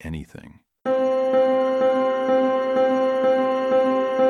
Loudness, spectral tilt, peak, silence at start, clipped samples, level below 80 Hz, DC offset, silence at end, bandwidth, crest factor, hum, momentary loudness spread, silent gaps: -20 LUFS; -6.5 dB/octave; -8 dBFS; 0.05 s; under 0.1%; -52 dBFS; under 0.1%; 0 s; 7 kHz; 12 dB; none; 5 LU; none